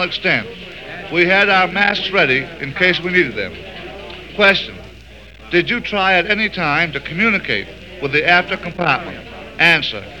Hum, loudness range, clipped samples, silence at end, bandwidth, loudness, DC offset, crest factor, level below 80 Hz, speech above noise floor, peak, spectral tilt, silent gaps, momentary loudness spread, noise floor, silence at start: none; 2 LU; under 0.1%; 0 s; 17.5 kHz; -15 LUFS; 0.4%; 18 dB; -44 dBFS; 23 dB; 0 dBFS; -5 dB/octave; none; 19 LU; -39 dBFS; 0 s